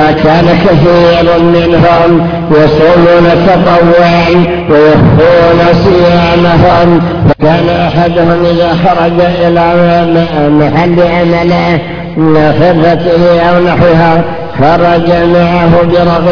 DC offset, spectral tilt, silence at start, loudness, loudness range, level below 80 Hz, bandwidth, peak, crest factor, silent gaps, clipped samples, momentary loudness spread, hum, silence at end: under 0.1%; -8.5 dB/octave; 0 s; -6 LUFS; 2 LU; -26 dBFS; 5.4 kHz; 0 dBFS; 6 dB; none; 5%; 4 LU; none; 0 s